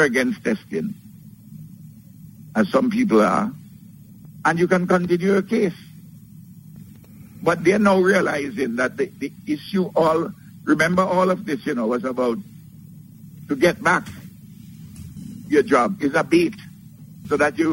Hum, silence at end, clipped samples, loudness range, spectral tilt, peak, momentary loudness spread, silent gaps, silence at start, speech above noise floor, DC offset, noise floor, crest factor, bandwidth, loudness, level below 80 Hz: none; 0 s; under 0.1%; 3 LU; -6 dB/octave; -4 dBFS; 23 LU; none; 0 s; 24 dB; under 0.1%; -44 dBFS; 18 dB; 16 kHz; -20 LUFS; -56 dBFS